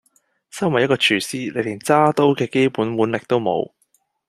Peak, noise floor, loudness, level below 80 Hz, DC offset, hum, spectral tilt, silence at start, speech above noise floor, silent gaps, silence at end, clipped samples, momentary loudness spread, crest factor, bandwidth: -2 dBFS; -65 dBFS; -19 LUFS; -62 dBFS; under 0.1%; none; -5 dB/octave; 0.55 s; 46 dB; none; 0.65 s; under 0.1%; 9 LU; 18 dB; 14 kHz